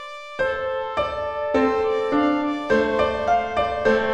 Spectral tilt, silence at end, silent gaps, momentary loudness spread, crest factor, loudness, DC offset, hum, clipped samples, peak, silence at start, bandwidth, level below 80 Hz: -5.5 dB/octave; 0 s; none; 5 LU; 14 dB; -22 LUFS; 0.2%; none; under 0.1%; -8 dBFS; 0 s; 9.2 kHz; -46 dBFS